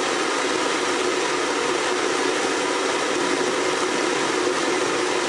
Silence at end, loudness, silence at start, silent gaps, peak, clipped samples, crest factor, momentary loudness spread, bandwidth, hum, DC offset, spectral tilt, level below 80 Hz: 0 s; -22 LUFS; 0 s; none; -10 dBFS; under 0.1%; 12 dB; 0 LU; 11.5 kHz; none; under 0.1%; -2 dB/octave; -64 dBFS